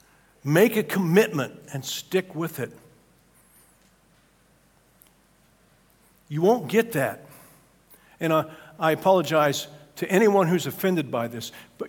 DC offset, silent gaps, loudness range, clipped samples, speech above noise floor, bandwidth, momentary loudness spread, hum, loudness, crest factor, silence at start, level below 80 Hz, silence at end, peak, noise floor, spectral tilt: under 0.1%; none; 11 LU; under 0.1%; 37 dB; 18 kHz; 15 LU; none; -24 LUFS; 22 dB; 0.45 s; -68 dBFS; 0 s; -4 dBFS; -61 dBFS; -5.5 dB/octave